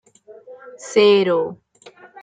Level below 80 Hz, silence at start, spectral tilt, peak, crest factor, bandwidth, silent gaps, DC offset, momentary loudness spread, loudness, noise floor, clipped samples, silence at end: -70 dBFS; 0.5 s; -4.5 dB/octave; -4 dBFS; 16 dB; 9.2 kHz; none; under 0.1%; 16 LU; -17 LUFS; -47 dBFS; under 0.1%; 0.7 s